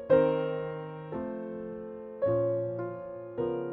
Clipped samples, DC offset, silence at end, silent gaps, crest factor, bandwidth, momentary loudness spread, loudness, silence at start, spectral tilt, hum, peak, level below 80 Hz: under 0.1%; under 0.1%; 0 s; none; 18 dB; 4 kHz; 13 LU; -32 LUFS; 0 s; -10.5 dB/octave; none; -12 dBFS; -62 dBFS